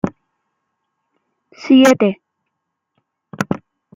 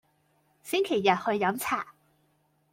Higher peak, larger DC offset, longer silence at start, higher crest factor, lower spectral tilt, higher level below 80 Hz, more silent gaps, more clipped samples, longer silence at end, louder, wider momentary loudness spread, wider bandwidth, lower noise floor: first, -2 dBFS vs -10 dBFS; neither; second, 0.05 s vs 0.65 s; about the same, 18 dB vs 20 dB; first, -5.5 dB/octave vs -4 dB/octave; first, -56 dBFS vs -72 dBFS; neither; neither; second, 0.4 s vs 0.8 s; first, -15 LUFS vs -27 LUFS; first, 21 LU vs 13 LU; about the same, 16 kHz vs 16.5 kHz; first, -76 dBFS vs -70 dBFS